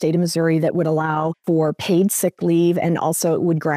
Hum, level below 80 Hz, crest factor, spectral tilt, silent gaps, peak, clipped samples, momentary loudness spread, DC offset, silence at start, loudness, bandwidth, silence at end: none; -64 dBFS; 12 dB; -6 dB/octave; none; -6 dBFS; under 0.1%; 3 LU; under 0.1%; 0 s; -19 LUFS; 16 kHz; 0 s